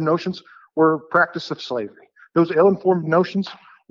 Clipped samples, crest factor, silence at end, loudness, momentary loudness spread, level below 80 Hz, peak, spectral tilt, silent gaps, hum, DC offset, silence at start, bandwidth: under 0.1%; 16 dB; 0.35 s; -20 LUFS; 14 LU; -68 dBFS; -4 dBFS; -7.5 dB/octave; none; none; under 0.1%; 0 s; 7.4 kHz